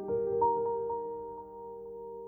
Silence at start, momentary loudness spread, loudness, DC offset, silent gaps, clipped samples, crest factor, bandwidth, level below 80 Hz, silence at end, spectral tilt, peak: 0 s; 16 LU; -33 LUFS; under 0.1%; none; under 0.1%; 16 dB; 2 kHz; -64 dBFS; 0 s; -11.5 dB/octave; -18 dBFS